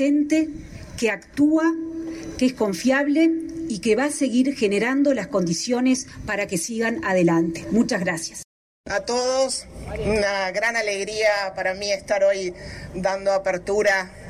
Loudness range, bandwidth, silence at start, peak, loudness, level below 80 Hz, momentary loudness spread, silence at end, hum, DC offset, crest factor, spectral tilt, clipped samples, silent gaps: 2 LU; 15.5 kHz; 0 s; -8 dBFS; -22 LUFS; -48 dBFS; 10 LU; 0 s; none; under 0.1%; 14 dB; -4.5 dB/octave; under 0.1%; 8.44-8.84 s